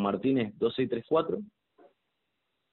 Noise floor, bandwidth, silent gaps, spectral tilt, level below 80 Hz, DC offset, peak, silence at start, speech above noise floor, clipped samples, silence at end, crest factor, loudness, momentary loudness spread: -81 dBFS; 4.2 kHz; none; -5.5 dB/octave; -68 dBFS; under 0.1%; -14 dBFS; 0 s; 52 dB; under 0.1%; 1.25 s; 18 dB; -30 LUFS; 9 LU